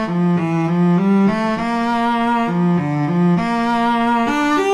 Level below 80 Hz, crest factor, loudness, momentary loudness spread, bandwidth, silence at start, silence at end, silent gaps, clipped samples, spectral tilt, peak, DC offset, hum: -48 dBFS; 10 dB; -17 LUFS; 3 LU; 10.5 kHz; 0 s; 0 s; none; under 0.1%; -7.5 dB/octave; -6 dBFS; under 0.1%; none